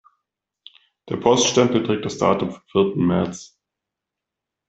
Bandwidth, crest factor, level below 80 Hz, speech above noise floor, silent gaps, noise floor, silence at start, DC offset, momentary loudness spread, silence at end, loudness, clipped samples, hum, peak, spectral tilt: 8.2 kHz; 20 dB; -58 dBFS; 65 dB; none; -85 dBFS; 1.05 s; under 0.1%; 10 LU; 1.25 s; -20 LUFS; under 0.1%; none; -2 dBFS; -4.5 dB/octave